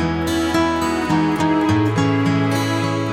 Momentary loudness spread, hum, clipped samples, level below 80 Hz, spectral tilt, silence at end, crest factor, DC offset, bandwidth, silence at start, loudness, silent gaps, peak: 3 LU; none; under 0.1%; -40 dBFS; -6 dB/octave; 0 s; 12 dB; under 0.1%; 16 kHz; 0 s; -18 LUFS; none; -6 dBFS